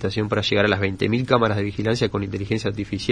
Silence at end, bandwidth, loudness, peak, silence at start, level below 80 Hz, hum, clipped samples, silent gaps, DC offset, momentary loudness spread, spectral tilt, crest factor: 0 s; 10 kHz; -22 LUFS; -2 dBFS; 0 s; -46 dBFS; none; under 0.1%; none; under 0.1%; 7 LU; -6 dB/octave; 20 dB